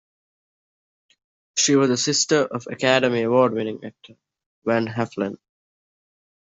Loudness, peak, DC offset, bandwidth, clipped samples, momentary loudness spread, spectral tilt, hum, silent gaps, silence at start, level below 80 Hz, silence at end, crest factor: -21 LUFS; -4 dBFS; under 0.1%; 8.2 kHz; under 0.1%; 12 LU; -3.5 dB/octave; none; 4.46-4.62 s; 1.55 s; -68 dBFS; 1.15 s; 20 dB